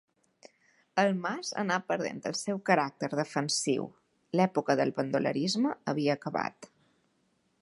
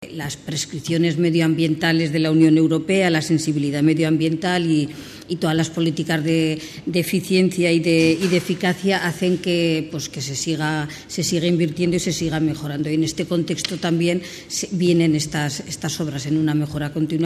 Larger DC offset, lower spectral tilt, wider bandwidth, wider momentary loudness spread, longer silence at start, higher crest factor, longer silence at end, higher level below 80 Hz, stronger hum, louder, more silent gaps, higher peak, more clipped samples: neither; about the same, -4.5 dB/octave vs -5.5 dB/octave; second, 11.5 kHz vs 14 kHz; second, 6 LU vs 9 LU; first, 0.95 s vs 0 s; about the same, 22 dB vs 18 dB; first, 0.95 s vs 0 s; second, -80 dBFS vs -52 dBFS; neither; second, -30 LUFS vs -20 LUFS; neither; second, -8 dBFS vs -2 dBFS; neither